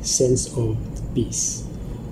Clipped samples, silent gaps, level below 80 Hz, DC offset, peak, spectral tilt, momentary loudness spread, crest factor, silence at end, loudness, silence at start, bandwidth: under 0.1%; none; -36 dBFS; 0.1%; -8 dBFS; -4.5 dB/octave; 13 LU; 16 dB; 0 s; -23 LUFS; 0 s; 15.5 kHz